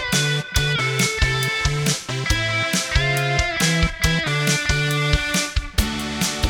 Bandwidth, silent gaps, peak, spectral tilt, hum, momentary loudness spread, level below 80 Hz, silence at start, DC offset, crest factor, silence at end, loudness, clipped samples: 19.5 kHz; none; -4 dBFS; -3.5 dB/octave; none; 4 LU; -28 dBFS; 0 s; under 0.1%; 16 dB; 0 s; -20 LUFS; under 0.1%